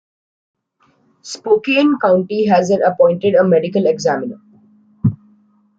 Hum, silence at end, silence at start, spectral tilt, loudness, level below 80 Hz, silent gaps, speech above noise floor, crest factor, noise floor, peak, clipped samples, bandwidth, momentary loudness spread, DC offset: none; 0.65 s; 1.25 s; -6.5 dB/octave; -15 LUFS; -58 dBFS; none; 45 dB; 14 dB; -59 dBFS; -2 dBFS; under 0.1%; 8 kHz; 9 LU; under 0.1%